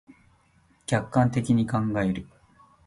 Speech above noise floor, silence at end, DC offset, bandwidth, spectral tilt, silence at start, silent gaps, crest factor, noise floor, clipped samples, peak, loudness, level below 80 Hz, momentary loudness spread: 38 dB; 0.6 s; under 0.1%; 11.5 kHz; -7 dB/octave; 0.9 s; none; 20 dB; -62 dBFS; under 0.1%; -8 dBFS; -25 LUFS; -52 dBFS; 8 LU